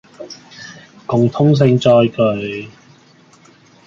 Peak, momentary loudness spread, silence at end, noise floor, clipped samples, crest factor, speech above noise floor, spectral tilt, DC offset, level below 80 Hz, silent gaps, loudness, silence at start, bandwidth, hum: -2 dBFS; 23 LU; 1.2 s; -48 dBFS; under 0.1%; 14 dB; 35 dB; -7.5 dB/octave; under 0.1%; -54 dBFS; none; -14 LUFS; 0.2 s; 7.4 kHz; none